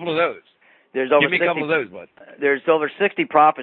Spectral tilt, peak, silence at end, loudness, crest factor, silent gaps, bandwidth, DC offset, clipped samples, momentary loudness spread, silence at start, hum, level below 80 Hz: -9.5 dB/octave; -2 dBFS; 0 s; -19 LUFS; 18 dB; none; 4.4 kHz; under 0.1%; under 0.1%; 11 LU; 0 s; none; -68 dBFS